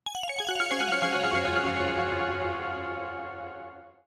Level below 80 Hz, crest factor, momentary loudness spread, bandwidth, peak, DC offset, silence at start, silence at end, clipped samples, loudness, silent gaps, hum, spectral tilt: -56 dBFS; 16 dB; 13 LU; 15 kHz; -14 dBFS; under 0.1%; 0.05 s; 0.15 s; under 0.1%; -28 LUFS; none; none; -3.5 dB/octave